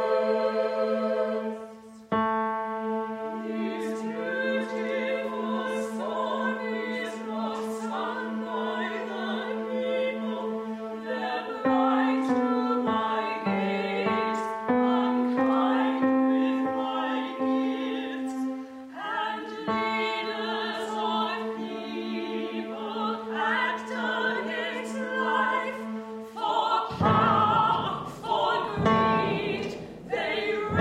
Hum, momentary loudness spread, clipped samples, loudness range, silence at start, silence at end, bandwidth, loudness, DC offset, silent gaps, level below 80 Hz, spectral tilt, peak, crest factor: none; 9 LU; under 0.1%; 5 LU; 0 s; 0 s; 12 kHz; -28 LUFS; under 0.1%; none; -62 dBFS; -6 dB/octave; -10 dBFS; 18 dB